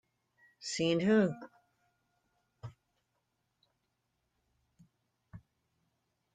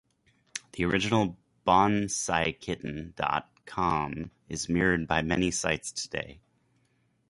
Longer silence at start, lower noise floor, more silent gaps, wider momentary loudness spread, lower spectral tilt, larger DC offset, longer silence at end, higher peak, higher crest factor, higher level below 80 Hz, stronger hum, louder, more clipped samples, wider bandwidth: about the same, 0.6 s vs 0.55 s; first, -82 dBFS vs -71 dBFS; neither; first, 24 LU vs 13 LU; first, -5.5 dB/octave vs -4 dB/octave; neither; about the same, 0.95 s vs 0.95 s; second, -18 dBFS vs -8 dBFS; about the same, 22 dB vs 22 dB; second, -74 dBFS vs -50 dBFS; neither; second, -31 LUFS vs -28 LUFS; neither; second, 9.6 kHz vs 11.5 kHz